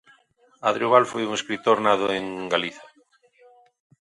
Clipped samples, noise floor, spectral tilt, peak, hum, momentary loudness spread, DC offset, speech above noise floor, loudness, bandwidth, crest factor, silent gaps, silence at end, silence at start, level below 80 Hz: under 0.1%; -61 dBFS; -4 dB/octave; -2 dBFS; none; 8 LU; under 0.1%; 38 dB; -23 LUFS; 11.5 kHz; 22 dB; none; 1.3 s; 0.6 s; -68 dBFS